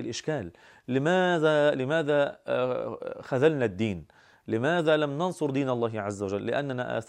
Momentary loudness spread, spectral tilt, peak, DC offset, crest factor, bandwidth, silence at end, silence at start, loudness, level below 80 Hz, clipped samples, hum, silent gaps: 10 LU; -6 dB/octave; -10 dBFS; under 0.1%; 18 dB; 10.5 kHz; 0.05 s; 0 s; -27 LUFS; -66 dBFS; under 0.1%; none; none